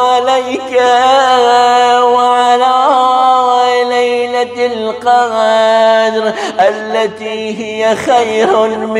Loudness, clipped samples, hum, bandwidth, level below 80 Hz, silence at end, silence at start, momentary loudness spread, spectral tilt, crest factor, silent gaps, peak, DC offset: -10 LUFS; under 0.1%; none; 12 kHz; -58 dBFS; 0 s; 0 s; 7 LU; -3 dB/octave; 10 dB; none; 0 dBFS; under 0.1%